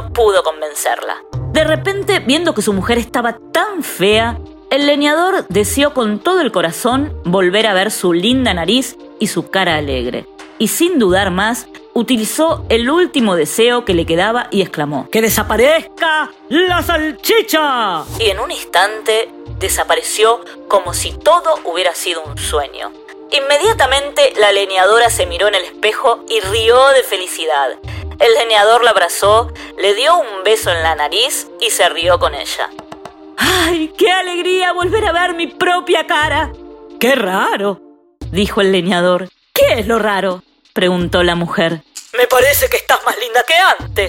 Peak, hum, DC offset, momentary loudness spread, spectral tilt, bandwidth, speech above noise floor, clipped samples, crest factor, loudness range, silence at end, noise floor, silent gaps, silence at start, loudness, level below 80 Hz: 0 dBFS; none; under 0.1%; 9 LU; -3.5 dB/octave; 16.5 kHz; 20 dB; under 0.1%; 14 dB; 3 LU; 0 s; -34 dBFS; none; 0 s; -13 LUFS; -36 dBFS